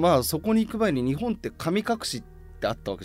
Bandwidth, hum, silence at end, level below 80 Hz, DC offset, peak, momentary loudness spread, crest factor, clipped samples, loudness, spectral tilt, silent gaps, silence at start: 16 kHz; none; 0 s; -46 dBFS; under 0.1%; -10 dBFS; 8 LU; 16 dB; under 0.1%; -26 LUFS; -5.5 dB/octave; none; 0 s